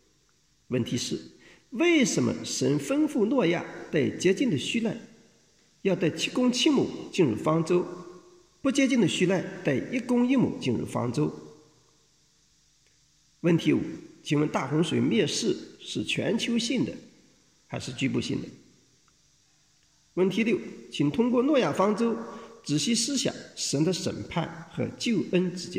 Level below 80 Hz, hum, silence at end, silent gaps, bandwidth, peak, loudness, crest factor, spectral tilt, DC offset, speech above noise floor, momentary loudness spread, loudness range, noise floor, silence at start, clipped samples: -66 dBFS; none; 0 s; none; 15 kHz; -10 dBFS; -27 LUFS; 16 dB; -5 dB/octave; under 0.1%; 40 dB; 12 LU; 5 LU; -67 dBFS; 0.7 s; under 0.1%